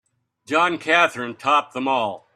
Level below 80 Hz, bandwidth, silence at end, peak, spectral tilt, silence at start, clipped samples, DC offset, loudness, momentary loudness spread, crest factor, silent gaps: -72 dBFS; 13 kHz; 0.15 s; -2 dBFS; -3.5 dB/octave; 0.5 s; under 0.1%; under 0.1%; -20 LUFS; 6 LU; 20 dB; none